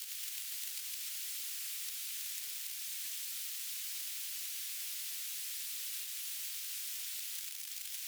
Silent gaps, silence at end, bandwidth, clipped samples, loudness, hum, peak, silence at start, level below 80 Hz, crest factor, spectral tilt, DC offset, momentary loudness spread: none; 0 s; over 20 kHz; under 0.1%; -38 LUFS; none; -22 dBFS; 0 s; under -90 dBFS; 20 dB; 10 dB/octave; under 0.1%; 1 LU